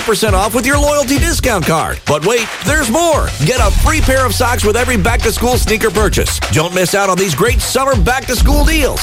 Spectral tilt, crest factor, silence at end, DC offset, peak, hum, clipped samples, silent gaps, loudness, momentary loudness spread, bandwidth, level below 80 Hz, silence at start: -4 dB/octave; 10 dB; 0 s; under 0.1%; -2 dBFS; none; under 0.1%; none; -12 LUFS; 2 LU; 16.5 kHz; -18 dBFS; 0 s